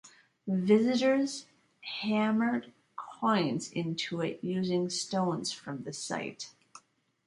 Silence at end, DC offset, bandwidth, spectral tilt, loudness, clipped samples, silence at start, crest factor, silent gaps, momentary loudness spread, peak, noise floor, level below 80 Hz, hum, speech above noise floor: 0.5 s; under 0.1%; 11.5 kHz; -5 dB/octave; -31 LUFS; under 0.1%; 0.05 s; 20 dB; none; 18 LU; -12 dBFS; -63 dBFS; -76 dBFS; none; 33 dB